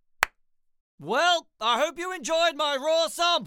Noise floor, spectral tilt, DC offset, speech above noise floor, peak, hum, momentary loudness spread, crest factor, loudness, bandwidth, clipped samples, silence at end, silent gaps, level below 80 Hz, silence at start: -67 dBFS; -1.5 dB/octave; under 0.1%; 42 dB; -2 dBFS; none; 6 LU; 24 dB; -25 LUFS; 17 kHz; under 0.1%; 0 s; 0.80-0.98 s; -62 dBFS; 0.2 s